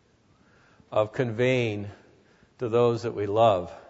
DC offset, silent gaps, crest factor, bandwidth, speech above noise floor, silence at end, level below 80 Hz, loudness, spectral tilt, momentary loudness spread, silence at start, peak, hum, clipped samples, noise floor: under 0.1%; none; 18 dB; 8 kHz; 37 dB; 0.1 s; -64 dBFS; -25 LUFS; -7 dB/octave; 11 LU; 0.9 s; -8 dBFS; none; under 0.1%; -62 dBFS